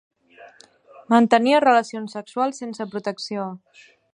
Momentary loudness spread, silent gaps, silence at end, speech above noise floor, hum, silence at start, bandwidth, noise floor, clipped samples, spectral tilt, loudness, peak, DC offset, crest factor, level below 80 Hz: 16 LU; none; 0.55 s; 30 dB; none; 0.4 s; 11 kHz; -50 dBFS; under 0.1%; -5 dB/octave; -21 LUFS; -2 dBFS; under 0.1%; 20 dB; -76 dBFS